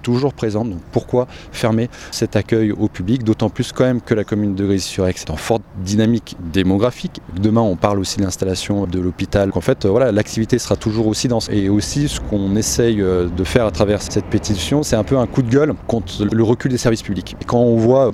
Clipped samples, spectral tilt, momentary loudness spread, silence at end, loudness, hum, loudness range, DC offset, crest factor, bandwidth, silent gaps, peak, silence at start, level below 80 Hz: under 0.1%; -6 dB/octave; 6 LU; 0 s; -18 LUFS; none; 2 LU; under 0.1%; 16 dB; 14 kHz; none; 0 dBFS; 0 s; -36 dBFS